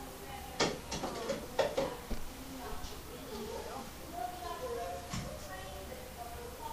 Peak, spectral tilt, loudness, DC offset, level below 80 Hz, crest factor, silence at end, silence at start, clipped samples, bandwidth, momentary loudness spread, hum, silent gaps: -16 dBFS; -3.5 dB/octave; -40 LUFS; under 0.1%; -50 dBFS; 24 dB; 0 s; 0 s; under 0.1%; 15.5 kHz; 11 LU; none; none